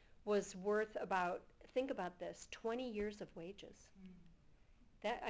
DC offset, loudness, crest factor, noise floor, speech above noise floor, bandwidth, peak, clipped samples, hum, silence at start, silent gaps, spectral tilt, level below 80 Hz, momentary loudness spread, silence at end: under 0.1%; -43 LUFS; 20 dB; -66 dBFS; 23 dB; 8 kHz; -24 dBFS; under 0.1%; none; 0.2 s; none; -4.5 dB/octave; -70 dBFS; 20 LU; 0 s